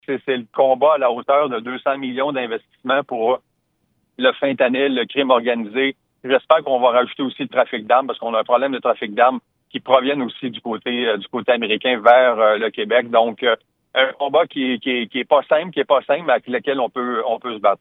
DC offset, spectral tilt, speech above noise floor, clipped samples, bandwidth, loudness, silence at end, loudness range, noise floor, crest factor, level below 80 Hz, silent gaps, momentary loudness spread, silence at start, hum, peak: under 0.1%; -7 dB/octave; 50 dB; under 0.1%; 4.1 kHz; -18 LUFS; 0.05 s; 3 LU; -68 dBFS; 18 dB; -76 dBFS; none; 8 LU; 0.1 s; none; 0 dBFS